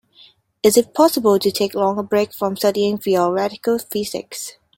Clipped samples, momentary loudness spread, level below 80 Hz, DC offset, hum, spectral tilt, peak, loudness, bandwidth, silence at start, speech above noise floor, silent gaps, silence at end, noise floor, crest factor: under 0.1%; 9 LU; -60 dBFS; under 0.1%; none; -4.5 dB/octave; -2 dBFS; -18 LUFS; 17 kHz; 0.65 s; 33 dB; none; 0.25 s; -51 dBFS; 18 dB